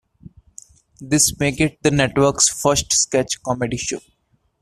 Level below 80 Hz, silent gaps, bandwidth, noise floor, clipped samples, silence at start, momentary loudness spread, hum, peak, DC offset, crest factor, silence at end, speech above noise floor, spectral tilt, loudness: -44 dBFS; none; 14.5 kHz; -46 dBFS; under 0.1%; 1 s; 8 LU; none; -2 dBFS; under 0.1%; 20 dB; 0.6 s; 27 dB; -3 dB/octave; -18 LUFS